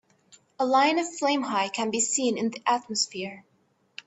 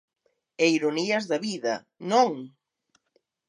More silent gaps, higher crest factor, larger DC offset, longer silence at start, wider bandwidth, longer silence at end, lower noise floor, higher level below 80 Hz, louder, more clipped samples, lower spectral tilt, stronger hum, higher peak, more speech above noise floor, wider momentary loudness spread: neither; about the same, 18 dB vs 20 dB; neither; about the same, 0.6 s vs 0.6 s; second, 8.4 kHz vs 10.5 kHz; second, 0.65 s vs 1 s; second, -59 dBFS vs -72 dBFS; first, -74 dBFS vs -84 dBFS; about the same, -25 LUFS vs -25 LUFS; neither; second, -2 dB/octave vs -4 dB/octave; neither; about the same, -10 dBFS vs -8 dBFS; second, 33 dB vs 47 dB; about the same, 9 LU vs 10 LU